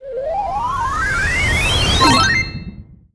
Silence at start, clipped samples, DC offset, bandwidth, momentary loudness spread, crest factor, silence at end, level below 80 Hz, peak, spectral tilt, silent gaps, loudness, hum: 0 s; under 0.1%; under 0.1%; 11 kHz; 12 LU; 18 dB; 0.2 s; -28 dBFS; 0 dBFS; -3.5 dB/octave; none; -15 LUFS; none